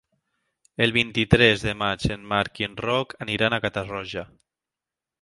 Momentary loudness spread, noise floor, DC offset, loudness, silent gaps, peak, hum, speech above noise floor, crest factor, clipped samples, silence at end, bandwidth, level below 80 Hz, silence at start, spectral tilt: 14 LU; -89 dBFS; under 0.1%; -23 LUFS; none; -2 dBFS; none; 65 dB; 24 dB; under 0.1%; 0.95 s; 11.5 kHz; -44 dBFS; 0.8 s; -5.5 dB/octave